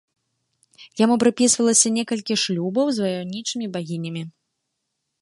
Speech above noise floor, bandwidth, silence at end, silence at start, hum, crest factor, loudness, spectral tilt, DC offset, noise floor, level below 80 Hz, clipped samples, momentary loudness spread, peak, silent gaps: 57 dB; 11.5 kHz; 0.9 s; 0.8 s; none; 20 dB; -20 LUFS; -3.5 dB/octave; under 0.1%; -78 dBFS; -68 dBFS; under 0.1%; 14 LU; -4 dBFS; none